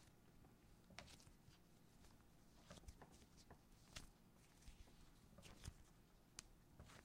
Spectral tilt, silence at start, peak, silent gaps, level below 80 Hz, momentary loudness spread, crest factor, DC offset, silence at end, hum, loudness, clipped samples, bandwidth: -3.5 dB/octave; 0 s; -30 dBFS; none; -70 dBFS; 8 LU; 36 dB; under 0.1%; 0 s; none; -64 LUFS; under 0.1%; 16 kHz